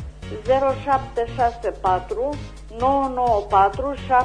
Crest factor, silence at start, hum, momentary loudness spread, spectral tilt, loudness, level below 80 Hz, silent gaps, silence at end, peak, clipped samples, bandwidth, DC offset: 16 dB; 0 s; none; 10 LU; -6.5 dB/octave; -21 LUFS; -38 dBFS; none; 0 s; -4 dBFS; under 0.1%; 10 kHz; under 0.1%